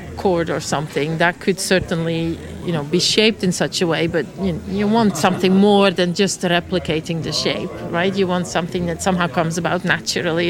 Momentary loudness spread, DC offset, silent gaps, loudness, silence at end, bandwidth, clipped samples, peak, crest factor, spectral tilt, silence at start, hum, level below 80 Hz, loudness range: 8 LU; under 0.1%; none; -18 LUFS; 0 s; 16.5 kHz; under 0.1%; 0 dBFS; 18 dB; -4.5 dB/octave; 0 s; none; -44 dBFS; 3 LU